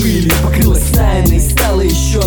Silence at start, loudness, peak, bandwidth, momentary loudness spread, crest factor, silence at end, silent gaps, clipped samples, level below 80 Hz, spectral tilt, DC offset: 0 s; -12 LUFS; 0 dBFS; over 20 kHz; 1 LU; 10 dB; 0 s; none; under 0.1%; -14 dBFS; -5 dB/octave; under 0.1%